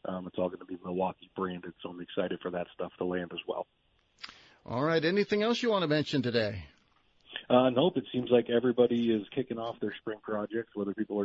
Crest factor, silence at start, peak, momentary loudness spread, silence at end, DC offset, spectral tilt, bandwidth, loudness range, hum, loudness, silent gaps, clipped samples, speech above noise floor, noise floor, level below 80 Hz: 22 dB; 0.05 s; -10 dBFS; 16 LU; 0 s; under 0.1%; -6.5 dB/octave; 7.8 kHz; 8 LU; none; -31 LUFS; none; under 0.1%; 37 dB; -67 dBFS; -68 dBFS